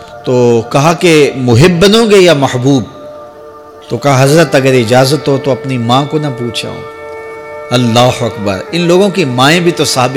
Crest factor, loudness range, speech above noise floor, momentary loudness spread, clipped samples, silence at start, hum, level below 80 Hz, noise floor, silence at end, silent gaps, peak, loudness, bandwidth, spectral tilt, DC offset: 10 dB; 5 LU; 23 dB; 18 LU; under 0.1%; 0 s; none; -40 dBFS; -31 dBFS; 0 s; none; 0 dBFS; -9 LUFS; 18.5 kHz; -5 dB/octave; under 0.1%